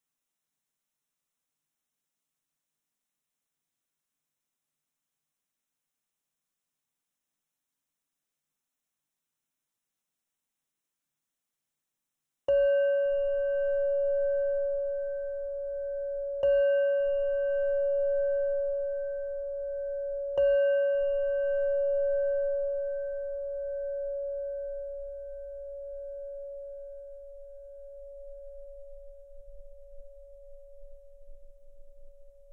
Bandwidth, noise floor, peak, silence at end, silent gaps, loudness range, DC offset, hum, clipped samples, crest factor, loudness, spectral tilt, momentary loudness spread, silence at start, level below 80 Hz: 3.1 kHz; -87 dBFS; -18 dBFS; 0 s; none; 18 LU; under 0.1%; none; under 0.1%; 14 dB; -29 LUFS; -5 dB/octave; 21 LU; 12.5 s; -54 dBFS